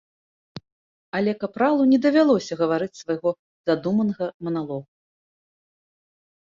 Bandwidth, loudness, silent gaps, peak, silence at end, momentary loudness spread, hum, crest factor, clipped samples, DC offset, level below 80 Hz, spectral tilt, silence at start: 7.6 kHz; -23 LUFS; 0.72-1.12 s, 3.39-3.64 s, 4.34-4.40 s; -6 dBFS; 1.7 s; 11 LU; none; 18 dB; under 0.1%; under 0.1%; -66 dBFS; -6.5 dB/octave; 0.55 s